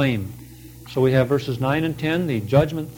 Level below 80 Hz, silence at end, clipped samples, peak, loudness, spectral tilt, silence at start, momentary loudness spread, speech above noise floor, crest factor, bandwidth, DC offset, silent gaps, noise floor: -48 dBFS; 0 s; under 0.1%; -4 dBFS; -21 LUFS; -7.5 dB/octave; 0 s; 19 LU; 21 dB; 18 dB; 19 kHz; under 0.1%; none; -41 dBFS